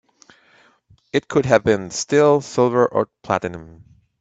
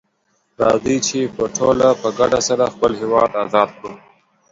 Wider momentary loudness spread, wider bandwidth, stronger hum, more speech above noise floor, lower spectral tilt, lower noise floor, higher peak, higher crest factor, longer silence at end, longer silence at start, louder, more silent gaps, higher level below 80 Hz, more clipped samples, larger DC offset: first, 9 LU vs 6 LU; about the same, 8.4 kHz vs 7.8 kHz; neither; second, 37 dB vs 48 dB; about the same, -5 dB/octave vs -4 dB/octave; second, -56 dBFS vs -65 dBFS; about the same, 0 dBFS vs 0 dBFS; about the same, 20 dB vs 18 dB; about the same, 0.55 s vs 0.55 s; first, 1.15 s vs 0.6 s; about the same, -19 LUFS vs -17 LUFS; neither; about the same, -54 dBFS vs -50 dBFS; neither; neither